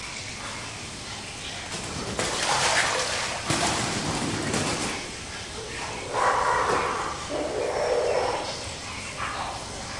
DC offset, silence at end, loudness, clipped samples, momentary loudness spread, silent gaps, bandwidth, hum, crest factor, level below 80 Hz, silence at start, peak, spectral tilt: under 0.1%; 0 s; -27 LUFS; under 0.1%; 11 LU; none; 11.5 kHz; none; 18 dB; -48 dBFS; 0 s; -10 dBFS; -2.5 dB/octave